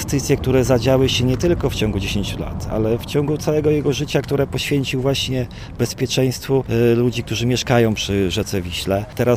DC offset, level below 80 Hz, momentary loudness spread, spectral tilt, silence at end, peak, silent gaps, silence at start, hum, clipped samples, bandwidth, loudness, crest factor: under 0.1%; -34 dBFS; 7 LU; -5.5 dB/octave; 0 s; -2 dBFS; none; 0 s; none; under 0.1%; 16 kHz; -19 LUFS; 16 dB